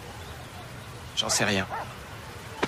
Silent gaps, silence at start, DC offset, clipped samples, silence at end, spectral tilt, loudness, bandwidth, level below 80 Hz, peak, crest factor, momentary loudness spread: none; 0 s; under 0.1%; under 0.1%; 0 s; -2.5 dB/octave; -27 LUFS; 15.5 kHz; -52 dBFS; -10 dBFS; 22 dB; 17 LU